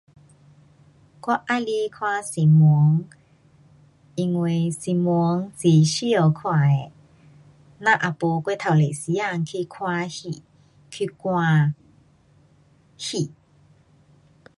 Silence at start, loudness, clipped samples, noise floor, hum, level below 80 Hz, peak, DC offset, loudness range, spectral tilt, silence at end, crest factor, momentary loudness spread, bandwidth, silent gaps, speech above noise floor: 1.25 s; -22 LUFS; under 0.1%; -57 dBFS; none; -64 dBFS; -4 dBFS; under 0.1%; 6 LU; -6.5 dB/octave; 1.3 s; 20 dB; 15 LU; 11.5 kHz; none; 36 dB